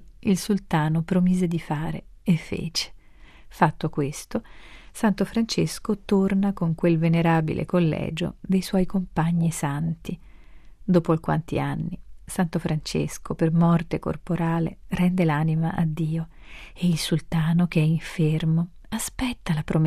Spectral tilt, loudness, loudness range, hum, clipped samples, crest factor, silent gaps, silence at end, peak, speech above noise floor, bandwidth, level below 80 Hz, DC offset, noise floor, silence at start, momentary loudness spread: -6.5 dB/octave; -24 LUFS; 4 LU; none; under 0.1%; 20 dB; none; 0 s; -4 dBFS; 24 dB; 14 kHz; -44 dBFS; under 0.1%; -47 dBFS; 0 s; 10 LU